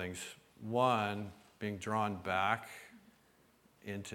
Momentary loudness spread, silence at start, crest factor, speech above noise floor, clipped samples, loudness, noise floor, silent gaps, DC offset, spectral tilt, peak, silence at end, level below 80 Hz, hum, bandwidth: 19 LU; 0 s; 22 dB; 32 dB; under 0.1%; -36 LUFS; -68 dBFS; none; under 0.1%; -5 dB/octave; -16 dBFS; 0 s; -72 dBFS; none; 19 kHz